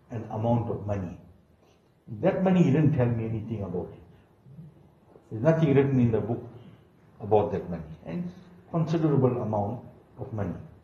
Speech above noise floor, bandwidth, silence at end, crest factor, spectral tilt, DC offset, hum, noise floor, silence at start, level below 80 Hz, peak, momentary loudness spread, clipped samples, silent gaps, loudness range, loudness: 36 dB; 7.2 kHz; 0.15 s; 20 dB; -9.5 dB/octave; under 0.1%; none; -61 dBFS; 0.1 s; -56 dBFS; -8 dBFS; 18 LU; under 0.1%; none; 3 LU; -27 LUFS